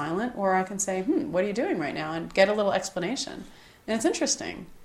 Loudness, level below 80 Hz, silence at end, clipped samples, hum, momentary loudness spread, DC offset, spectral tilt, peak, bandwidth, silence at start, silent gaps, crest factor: -27 LUFS; -58 dBFS; 0 s; under 0.1%; none; 9 LU; under 0.1%; -3.5 dB/octave; -6 dBFS; 14.5 kHz; 0 s; none; 22 dB